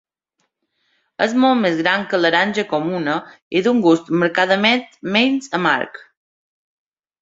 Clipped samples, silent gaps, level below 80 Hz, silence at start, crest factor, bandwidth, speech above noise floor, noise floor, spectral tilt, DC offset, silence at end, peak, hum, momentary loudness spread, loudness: under 0.1%; 3.42-3.51 s; -64 dBFS; 1.2 s; 18 dB; 7.8 kHz; 54 dB; -72 dBFS; -5 dB/octave; under 0.1%; 1.25 s; -2 dBFS; none; 7 LU; -17 LUFS